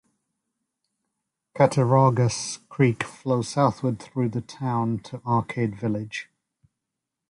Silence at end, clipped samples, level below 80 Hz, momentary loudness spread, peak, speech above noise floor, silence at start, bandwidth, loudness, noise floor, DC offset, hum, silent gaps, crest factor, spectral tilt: 1.05 s; under 0.1%; -60 dBFS; 12 LU; -6 dBFS; 61 dB; 1.55 s; 11 kHz; -24 LUFS; -85 dBFS; under 0.1%; none; none; 20 dB; -6.5 dB/octave